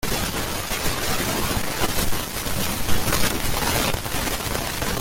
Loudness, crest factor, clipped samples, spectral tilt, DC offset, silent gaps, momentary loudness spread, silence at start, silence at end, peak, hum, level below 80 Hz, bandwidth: -24 LUFS; 18 dB; under 0.1%; -3 dB/octave; under 0.1%; none; 4 LU; 0 s; 0 s; -4 dBFS; none; -32 dBFS; 17 kHz